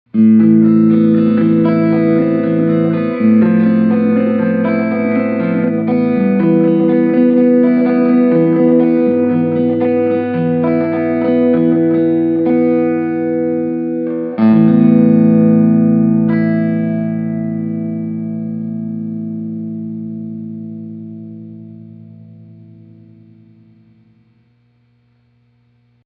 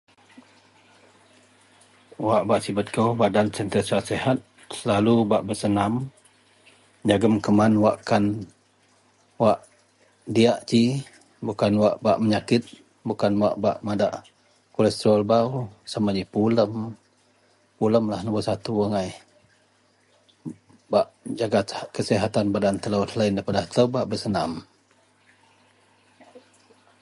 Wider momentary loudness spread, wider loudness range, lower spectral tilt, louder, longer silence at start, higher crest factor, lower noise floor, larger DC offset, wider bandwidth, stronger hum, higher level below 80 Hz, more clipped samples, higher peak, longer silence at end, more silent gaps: about the same, 14 LU vs 13 LU; first, 13 LU vs 5 LU; first, -9.5 dB/octave vs -6.5 dB/octave; first, -13 LUFS vs -23 LUFS; second, 0.15 s vs 2.2 s; second, 12 dB vs 20 dB; second, -55 dBFS vs -62 dBFS; neither; second, 4.7 kHz vs 11.5 kHz; first, 60 Hz at -50 dBFS vs none; about the same, -60 dBFS vs -56 dBFS; neither; about the same, -2 dBFS vs -4 dBFS; first, 3.55 s vs 0.65 s; neither